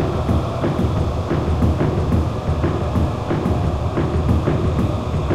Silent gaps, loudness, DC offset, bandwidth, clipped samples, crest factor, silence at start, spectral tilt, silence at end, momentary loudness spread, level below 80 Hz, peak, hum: none; -20 LUFS; under 0.1%; 11.5 kHz; under 0.1%; 14 dB; 0 s; -8 dB/octave; 0 s; 3 LU; -26 dBFS; -4 dBFS; none